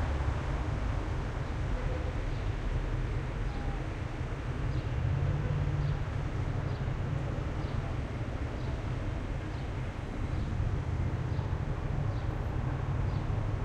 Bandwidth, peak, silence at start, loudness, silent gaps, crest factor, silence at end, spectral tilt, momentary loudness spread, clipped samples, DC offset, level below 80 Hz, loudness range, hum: 9.4 kHz; -20 dBFS; 0 s; -35 LUFS; none; 12 dB; 0 s; -7.5 dB/octave; 5 LU; under 0.1%; under 0.1%; -36 dBFS; 2 LU; none